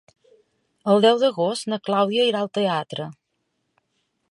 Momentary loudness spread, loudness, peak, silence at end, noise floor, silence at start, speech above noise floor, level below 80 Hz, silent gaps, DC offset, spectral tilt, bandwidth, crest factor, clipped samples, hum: 14 LU; -21 LUFS; -4 dBFS; 1.2 s; -74 dBFS; 0.85 s; 54 dB; -74 dBFS; none; under 0.1%; -5 dB/octave; 11.5 kHz; 18 dB; under 0.1%; none